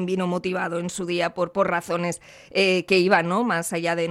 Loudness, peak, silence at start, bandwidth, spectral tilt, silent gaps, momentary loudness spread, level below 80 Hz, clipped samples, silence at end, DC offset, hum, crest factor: -23 LUFS; -4 dBFS; 0 s; 13.5 kHz; -4.5 dB/octave; none; 9 LU; -64 dBFS; under 0.1%; 0 s; under 0.1%; none; 20 dB